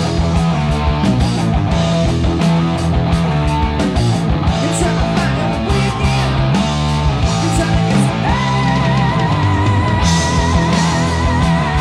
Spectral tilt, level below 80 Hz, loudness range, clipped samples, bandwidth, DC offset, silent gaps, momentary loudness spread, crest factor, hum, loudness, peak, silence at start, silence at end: -6 dB/octave; -22 dBFS; 1 LU; under 0.1%; 12 kHz; under 0.1%; none; 2 LU; 12 dB; none; -15 LUFS; -2 dBFS; 0 s; 0 s